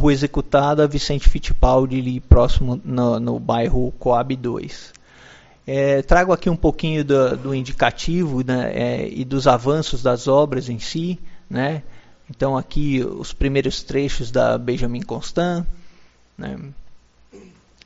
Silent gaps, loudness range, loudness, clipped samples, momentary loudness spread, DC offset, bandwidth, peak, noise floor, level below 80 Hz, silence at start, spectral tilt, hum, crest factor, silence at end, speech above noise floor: none; 5 LU; -20 LUFS; under 0.1%; 11 LU; under 0.1%; 8 kHz; 0 dBFS; -48 dBFS; -26 dBFS; 0 s; -6 dB/octave; none; 18 dB; 0.45 s; 30 dB